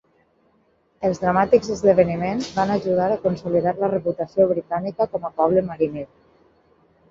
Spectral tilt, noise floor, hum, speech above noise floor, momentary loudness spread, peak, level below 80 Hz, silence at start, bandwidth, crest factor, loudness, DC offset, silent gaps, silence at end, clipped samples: -7 dB/octave; -62 dBFS; none; 42 dB; 8 LU; -2 dBFS; -54 dBFS; 1 s; 7.6 kHz; 18 dB; -21 LUFS; under 0.1%; none; 1.05 s; under 0.1%